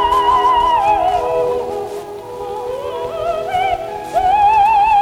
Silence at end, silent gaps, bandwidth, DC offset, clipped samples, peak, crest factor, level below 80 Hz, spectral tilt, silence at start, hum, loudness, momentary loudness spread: 0 s; none; 16.5 kHz; under 0.1%; under 0.1%; -4 dBFS; 12 dB; -40 dBFS; -4 dB/octave; 0 s; none; -15 LUFS; 14 LU